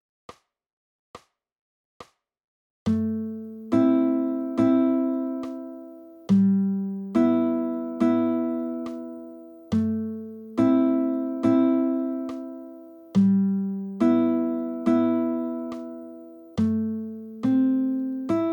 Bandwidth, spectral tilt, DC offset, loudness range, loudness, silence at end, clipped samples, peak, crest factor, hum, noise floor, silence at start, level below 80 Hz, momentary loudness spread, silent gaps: 18.5 kHz; -9.5 dB/octave; under 0.1%; 3 LU; -24 LUFS; 0 s; under 0.1%; -10 dBFS; 16 dB; none; -44 dBFS; 1.15 s; -64 dBFS; 17 LU; 1.52-2.00 s, 2.44-2.86 s